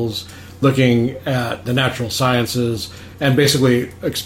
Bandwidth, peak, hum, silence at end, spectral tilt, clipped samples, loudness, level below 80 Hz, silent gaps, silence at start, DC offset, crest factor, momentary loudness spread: 16.5 kHz; -2 dBFS; none; 0 s; -5 dB/octave; under 0.1%; -17 LUFS; -46 dBFS; none; 0 s; under 0.1%; 16 dB; 11 LU